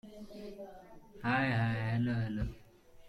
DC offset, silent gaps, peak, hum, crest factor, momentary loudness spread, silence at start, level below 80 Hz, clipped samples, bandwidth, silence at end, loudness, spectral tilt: under 0.1%; none; -20 dBFS; none; 16 dB; 19 LU; 0.05 s; -52 dBFS; under 0.1%; 11.5 kHz; 0 s; -34 LUFS; -8 dB/octave